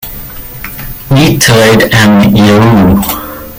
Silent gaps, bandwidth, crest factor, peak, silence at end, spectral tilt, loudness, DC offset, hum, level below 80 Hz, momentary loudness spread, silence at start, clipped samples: none; 17 kHz; 8 dB; 0 dBFS; 0 s; -5 dB/octave; -6 LUFS; under 0.1%; none; -28 dBFS; 17 LU; 0 s; 0.3%